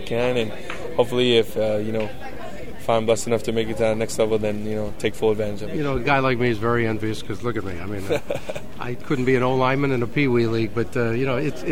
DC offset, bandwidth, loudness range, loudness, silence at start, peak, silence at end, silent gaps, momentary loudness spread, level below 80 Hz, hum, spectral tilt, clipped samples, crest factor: 4%; 16 kHz; 2 LU; -23 LUFS; 0 s; -4 dBFS; 0 s; none; 11 LU; -44 dBFS; none; -5.5 dB/octave; under 0.1%; 18 dB